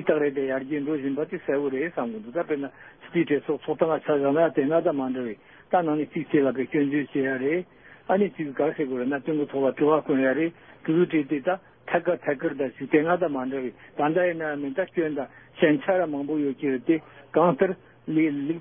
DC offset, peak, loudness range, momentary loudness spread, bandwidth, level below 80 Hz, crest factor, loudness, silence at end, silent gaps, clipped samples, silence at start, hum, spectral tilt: under 0.1%; -6 dBFS; 2 LU; 8 LU; 3.7 kHz; -70 dBFS; 18 dB; -25 LUFS; 0 s; none; under 0.1%; 0 s; none; -11 dB/octave